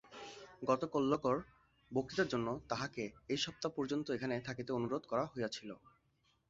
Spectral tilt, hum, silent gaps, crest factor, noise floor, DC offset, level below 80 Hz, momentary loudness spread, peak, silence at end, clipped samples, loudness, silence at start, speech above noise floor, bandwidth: -4 dB/octave; none; none; 22 dB; -77 dBFS; under 0.1%; -70 dBFS; 11 LU; -18 dBFS; 0.7 s; under 0.1%; -39 LUFS; 0.05 s; 39 dB; 7.6 kHz